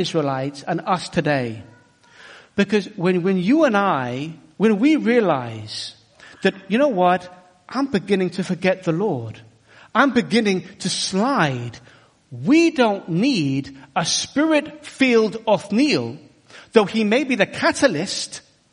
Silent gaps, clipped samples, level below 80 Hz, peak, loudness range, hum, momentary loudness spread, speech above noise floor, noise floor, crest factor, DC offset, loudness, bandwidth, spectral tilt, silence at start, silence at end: none; under 0.1%; -60 dBFS; 0 dBFS; 3 LU; none; 13 LU; 31 dB; -51 dBFS; 20 dB; under 0.1%; -20 LUFS; 10.5 kHz; -5 dB/octave; 0 s; 0.35 s